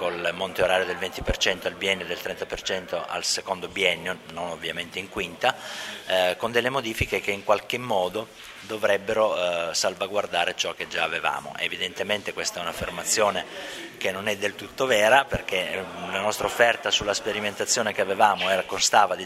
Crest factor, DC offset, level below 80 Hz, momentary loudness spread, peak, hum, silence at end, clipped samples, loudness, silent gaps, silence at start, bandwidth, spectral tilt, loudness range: 22 dB; under 0.1%; -48 dBFS; 10 LU; -4 dBFS; none; 0 s; under 0.1%; -25 LUFS; none; 0 s; 16 kHz; -2 dB/octave; 4 LU